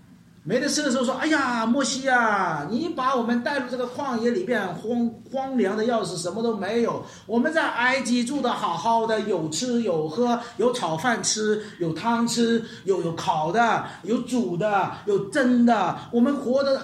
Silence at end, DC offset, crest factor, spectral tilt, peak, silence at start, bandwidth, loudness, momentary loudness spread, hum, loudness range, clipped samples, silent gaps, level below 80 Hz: 0 s; under 0.1%; 16 dB; -4 dB/octave; -8 dBFS; 0.1 s; 13 kHz; -24 LUFS; 6 LU; none; 3 LU; under 0.1%; none; -66 dBFS